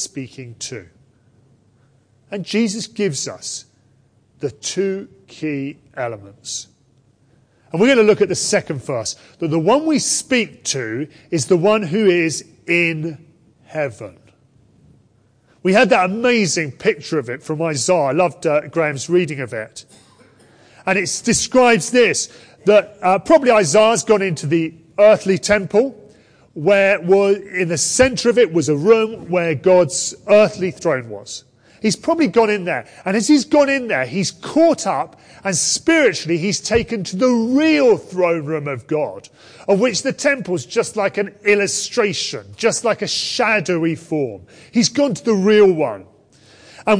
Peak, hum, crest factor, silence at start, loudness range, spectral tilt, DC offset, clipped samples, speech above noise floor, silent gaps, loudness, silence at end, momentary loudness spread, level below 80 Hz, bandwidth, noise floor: -2 dBFS; none; 16 dB; 0 s; 9 LU; -4 dB/octave; under 0.1%; under 0.1%; 39 dB; none; -17 LUFS; 0 s; 14 LU; -54 dBFS; 10.5 kHz; -56 dBFS